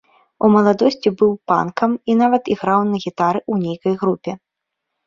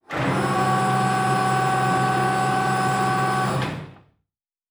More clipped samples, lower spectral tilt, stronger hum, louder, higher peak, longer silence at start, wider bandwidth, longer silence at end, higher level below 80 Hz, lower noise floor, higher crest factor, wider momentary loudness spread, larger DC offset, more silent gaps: neither; first, -7.5 dB/octave vs -5.5 dB/octave; neither; first, -17 LUFS vs -21 LUFS; first, -2 dBFS vs -8 dBFS; first, 0.4 s vs 0.1 s; second, 7.4 kHz vs over 20 kHz; about the same, 0.7 s vs 0.75 s; second, -60 dBFS vs -52 dBFS; about the same, -79 dBFS vs -80 dBFS; about the same, 16 dB vs 14 dB; first, 8 LU vs 4 LU; neither; neither